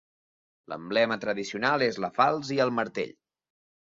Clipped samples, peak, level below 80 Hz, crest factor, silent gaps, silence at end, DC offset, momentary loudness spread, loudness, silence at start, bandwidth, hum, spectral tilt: under 0.1%; -8 dBFS; -72 dBFS; 22 dB; none; 0.7 s; under 0.1%; 11 LU; -27 LUFS; 0.7 s; 7.8 kHz; none; -5 dB/octave